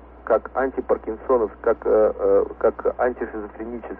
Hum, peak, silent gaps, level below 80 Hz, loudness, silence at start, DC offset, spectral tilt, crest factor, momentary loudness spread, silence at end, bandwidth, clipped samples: none; -8 dBFS; none; -46 dBFS; -22 LUFS; 0 s; under 0.1%; -10 dB/octave; 14 dB; 12 LU; 0 s; 3.1 kHz; under 0.1%